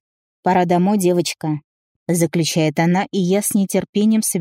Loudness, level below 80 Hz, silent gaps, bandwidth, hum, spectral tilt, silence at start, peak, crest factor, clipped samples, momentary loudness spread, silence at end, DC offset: -18 LUFS; -62 dBFS; 1.64-2.06 s, 3.89-3.93 s; 16 kHz; none; -5 dB/octave; 0.45 s; -4 dBFS; 14 dB; under 0.1%; 8 LU; 0 s; under 0.1%